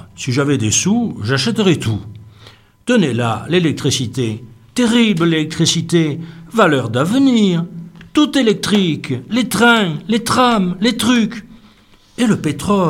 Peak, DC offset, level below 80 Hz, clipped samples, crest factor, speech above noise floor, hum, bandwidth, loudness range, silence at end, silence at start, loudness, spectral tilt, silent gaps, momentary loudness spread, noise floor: 0 dBFS; under 0.1%; -50 dBFS; under 0.1%; 14 dB; 33 dB; none; 16 kHz; 3 LU; 0 s; 0.15 s; -15 LUFS; -4.5 dB/octave; none; 9 LU; -48 dBFS